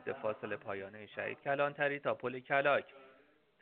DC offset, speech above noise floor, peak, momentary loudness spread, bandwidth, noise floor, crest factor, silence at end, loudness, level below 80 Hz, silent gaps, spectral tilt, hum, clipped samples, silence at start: under 0.1%; 31 dB; -16 dBFS; 12 LU; 4.5 kHz; -67 dBFS; 22 dB; 0.5 s; -36 LUFS; -82 dBFS; none; -3 dB/octave; none; under 0.1%; 0 s